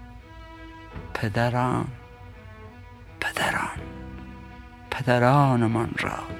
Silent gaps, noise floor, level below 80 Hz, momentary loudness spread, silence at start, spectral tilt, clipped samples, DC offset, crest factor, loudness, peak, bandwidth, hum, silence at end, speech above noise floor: none; -45 dBFS; -46 dBFS; 25 LU; 0 s; -6.5 dB/octave; under 0.1%; under 0.1%; 22 dB; -24 LUFS; -4 dBFS; 16 kHz; none; 0 s; 22 dB